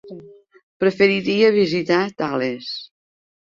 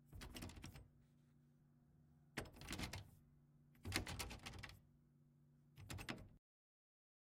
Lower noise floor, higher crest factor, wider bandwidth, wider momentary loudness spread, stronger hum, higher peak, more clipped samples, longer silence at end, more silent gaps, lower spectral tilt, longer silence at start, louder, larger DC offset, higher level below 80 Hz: second, -43 dBFS vs -73 dBFS; second, 18 dB vs 34 dB; second, 7.4 kHz vs 16.5 kHz; second, 14 LU vs 19 LU; neither; first, -2 dBFS vs -22 dBFS; neither; second, 0.55 s vs 0.85 s; first, 0.63-0.80 s vs none; first, -6 dB/octave vs -3.5 dB/octave; about the same, 0.05 s vs 0 s; first, -19 LUFS vs -52 LUFS; neither; about the same, -62 dBFS vs -66 dBFS